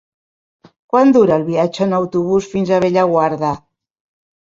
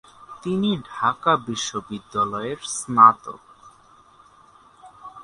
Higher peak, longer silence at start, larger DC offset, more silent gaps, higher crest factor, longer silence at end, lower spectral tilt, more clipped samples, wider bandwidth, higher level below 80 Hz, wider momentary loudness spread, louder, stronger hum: about the same, -2 dBFS vs 0 dBFS; first, 0.95 s vs 0.3 s; neither; neither; second, 14 dB vs 22 dB; first, 1.05 s vs 0 s; first, -7.5 dB/octave vs -4 dB/octave; neither; second, 7.6 kHz vs 11.5 kHz; first, -54 dBFS vs -62 dBFS; second, 7 LU vs 19 LU; first, -15 LUFS vs -21 LUFS; neither